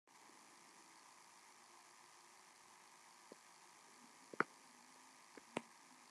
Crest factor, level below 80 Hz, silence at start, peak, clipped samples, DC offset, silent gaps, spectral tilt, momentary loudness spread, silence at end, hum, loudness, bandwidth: 38 dB; under -90 dBFS; 0.05 s; -18 dBFS; under 0.1%; under 0.1%; none; -3 dB/octave; 19 LU; 0 s; none; -55 LUFS; 13 kHz